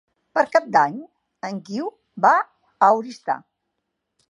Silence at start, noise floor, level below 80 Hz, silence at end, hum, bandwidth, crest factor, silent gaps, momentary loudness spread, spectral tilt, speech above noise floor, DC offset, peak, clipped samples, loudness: 0.35 s; -78 dBFS; -78 dBFS; 0.95 s; none; 10.5 kHz; 20 dB; none; 15 LU; -5 dB/octave; 58 dB; under 0.1%; -2 dBFS; under 0.1%; -21 LUFS